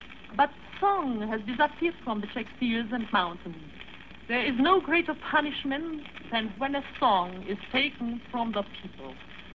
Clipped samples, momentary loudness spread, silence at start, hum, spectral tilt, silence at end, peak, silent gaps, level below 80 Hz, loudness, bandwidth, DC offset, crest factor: under 0.1%; 18 LU; 0 s; none; -6.5 dB/octave; 0.05 s; -10 dBFS; none; -56 dBFS; -28 LUFS; 7.2 kHz; 0.3%; 20 dB